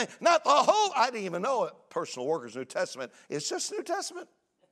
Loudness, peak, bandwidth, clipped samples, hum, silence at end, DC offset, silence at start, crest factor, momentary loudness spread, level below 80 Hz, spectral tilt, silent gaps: -29 LUFS; -8 dBFS; 14 kHz; under 0.1%; none; 0.45 s; under 0.1%; 0 s; 20 dB; 14 LU; -88 dBFS; -2.5 dB/octave; none